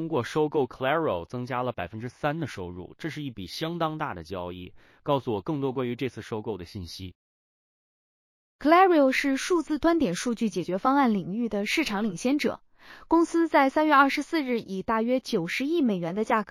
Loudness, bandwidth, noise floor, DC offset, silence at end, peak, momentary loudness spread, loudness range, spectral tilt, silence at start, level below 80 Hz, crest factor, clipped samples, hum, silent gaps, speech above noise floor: -26 LUFS; 15.5 kHz; under -90 dBFS; under 0.1%; 0 s; -6 dBFS; 15 LU; 9 LU; -5.5 dB/octave; 0 s; -58 dBFS; 20 dB; under 0.1%; none; 7.15-8.59 s; over 64 dB